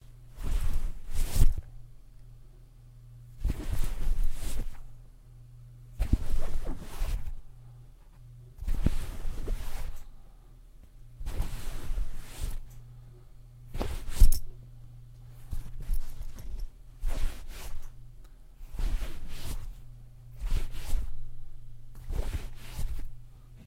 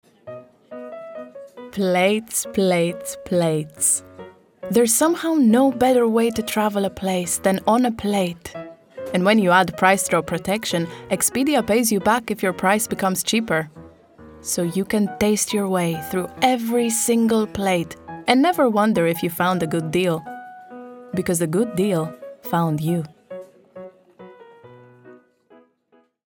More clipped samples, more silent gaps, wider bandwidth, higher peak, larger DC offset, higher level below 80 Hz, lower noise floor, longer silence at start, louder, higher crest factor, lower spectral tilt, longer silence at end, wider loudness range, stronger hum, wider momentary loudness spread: neither; neither; second, 15.5 kHz vs over 20 kHz; second, -6 dBFS vs 0 dBFS; neither; first, -32 dBFS vs -56 dBFS; second, -51 dBFS vs -60 dBFS; second, 0.1 s vs 0.25 s; second, -37 LUFS vs -20 LUFS; about the same, 24 dB vs 20 dB; about the same, -5.5 dB/octave vs -4.5 dB/octave; second, 0.05 s vs 1.1 s; about the same, 7 LU vs 5 LU; neither; about the same, 22 LU vs 20 LU